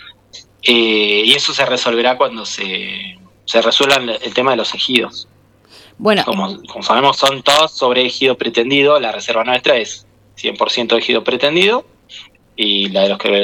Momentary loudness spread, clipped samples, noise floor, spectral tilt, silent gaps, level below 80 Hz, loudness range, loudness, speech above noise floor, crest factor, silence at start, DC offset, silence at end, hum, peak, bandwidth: 11 LU; under 0.1%; -46 dBFS; -3 dB/octave; none; -58 dBFS; 3 LU; -14 LUFS; 31 dB; 16 dB; 0 s; under 0.1%; 0 s; none; 0 dBFS; 18.5 kHz